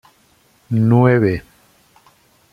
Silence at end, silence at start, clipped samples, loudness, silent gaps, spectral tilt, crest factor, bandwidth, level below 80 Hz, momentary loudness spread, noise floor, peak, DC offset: 1.1 s; 0.7 s; under 0.1%; -16 LUFS; none; -9.5 dB/octave; 16 dB; 5.2 kHz; -48 dBFS; 11 LU; -56 dBFS; -2 dBFS; under 0.1%